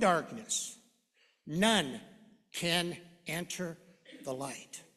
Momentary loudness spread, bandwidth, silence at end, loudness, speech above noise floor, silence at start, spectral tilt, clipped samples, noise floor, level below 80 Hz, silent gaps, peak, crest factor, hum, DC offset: 18 LU; 14 kHz; 0.15 s; -34 LUFS; 38 dB; 0 s; -3 dB/octave; under 0.1%; -72 dBFS; -70 dBFS; none; -12 dBFS; 24 dB; none; under 0.1%